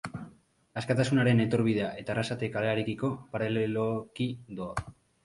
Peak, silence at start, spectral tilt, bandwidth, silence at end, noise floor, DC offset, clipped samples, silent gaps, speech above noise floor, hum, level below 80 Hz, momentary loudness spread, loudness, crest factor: -12 dBFS; 0.05 s; -7 dB/octave; 11.5 kHz; 0.35 s; -57 dBFS; under 0.1%; under 0.1%; none; 29 dB; none; -58 dBFS; 14 LU; -30 LUFS; 18 dB